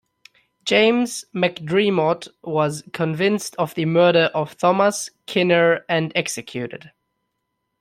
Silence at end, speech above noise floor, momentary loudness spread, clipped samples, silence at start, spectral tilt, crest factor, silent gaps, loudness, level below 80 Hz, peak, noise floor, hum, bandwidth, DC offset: 0.9 s; 56 dB; 12 LU; under 0.1%; 0.65 s; -4.5 dB/octave; 18 dB; none; -20 LUFS; -64 dBFS; -2 dBFS; -76 dBFS; none; 15 kHz; under 0.1%